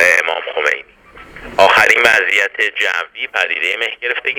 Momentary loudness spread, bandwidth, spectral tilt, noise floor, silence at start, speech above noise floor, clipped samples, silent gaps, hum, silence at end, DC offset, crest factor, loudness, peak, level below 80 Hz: 11 LU; over 20 kHz; -1 dB/octave; -40 dBFS; 0 s; 24 dB; 0.1%; none; none; 0 s; under 0.1%; 16 dB; -13 LUFS; 0 dBFS; -50 dBFS